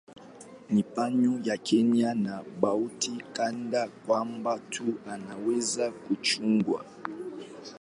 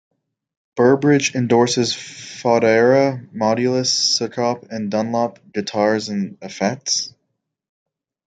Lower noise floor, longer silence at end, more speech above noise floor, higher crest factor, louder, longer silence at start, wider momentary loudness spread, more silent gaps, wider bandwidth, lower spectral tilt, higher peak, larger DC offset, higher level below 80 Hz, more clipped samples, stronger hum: second, -49 dBFS vs -75 dBFS; second, 0.05 s vs 1.2 s; second, 20 dB vs 57 dB; about the same, 20 dB vs 16 dB; second, -29 LUFS vs -18 LUFS; second, 0.1 s vs 0.75 s; about the same, 14 LU vs 12 LU; neither; first, 11.5 kHz vs 9.4 kHz; about the same, -4.5 dB/octave vs -4 dB/octave; second, -8 dBFS vs -2 dBFS; neither; second, -74 dBFS vs -66 dBFS; neither; neither